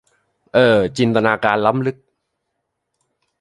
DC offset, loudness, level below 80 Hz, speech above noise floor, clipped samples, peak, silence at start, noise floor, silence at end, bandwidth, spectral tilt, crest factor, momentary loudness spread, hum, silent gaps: under 0.1%; -16 LUFS; -54 dBFS; 60 dB; under 0.1%; 0 dBFS; 0.55 s; -75 dBFS; 1.45 s; 11.5 kHz; -6.5 dB/octave; 18 dB; 7 LU; none; none